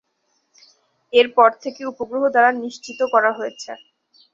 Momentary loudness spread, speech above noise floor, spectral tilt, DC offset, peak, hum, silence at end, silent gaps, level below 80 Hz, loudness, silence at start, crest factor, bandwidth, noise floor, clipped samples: 16 LU; 50 dB; -2.5 dB/octave; under 0.1%; -2 dBFS; none; 0.55 s; none; -70 dBFS; -18 LUFS; 1.15 s; 18 dB; 7.6 kHz; -69 dBFS; under 0.1%